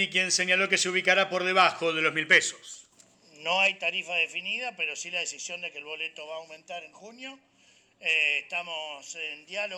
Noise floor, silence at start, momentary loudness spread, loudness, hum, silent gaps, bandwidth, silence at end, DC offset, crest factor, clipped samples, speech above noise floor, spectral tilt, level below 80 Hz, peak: -62 dBFS; 0 s; 19 LU; -26 LUFS; none; none; 19.5 kHz; 0 s; under 0.1%; 22 dB; under 0.1%; 34 dB; -1 dB/octave; -86 dBFS; -8 dBFS